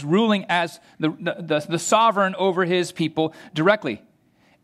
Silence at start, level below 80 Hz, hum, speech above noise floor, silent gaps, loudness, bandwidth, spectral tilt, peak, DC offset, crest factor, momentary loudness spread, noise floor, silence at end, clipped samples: 0 s; -72 dBFS; none; 38 dB; none; -22 LUFS; 14.5 kHz; -4.5 dB/octave; -2 dBFS; under 0.1%; 20 dB; 10 LU; -60 dBFS; 0.65 s; under 0.1%